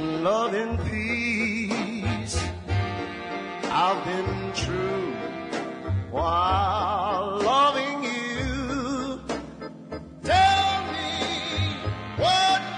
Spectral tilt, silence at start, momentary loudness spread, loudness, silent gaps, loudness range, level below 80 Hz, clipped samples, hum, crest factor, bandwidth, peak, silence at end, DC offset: -4.5 dB/octave; 0 s; 12 LU; -25 LUFS; none; 3 LU; -44 dBFS; under 0.1%; none; 16 dB; 11 kHz; -10 dBFS; 0 s; under 0.1%